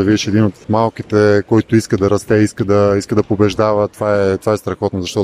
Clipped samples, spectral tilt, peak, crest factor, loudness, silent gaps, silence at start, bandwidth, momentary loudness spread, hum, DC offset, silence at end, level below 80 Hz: under 0.1%; -6.5 dB/octave; 0 dBFS; 14 dB; -15 LUFS; none; 0 s; 14.5 kHz; 5 LU; none; under 0.1%; 0 s; -44 dBFS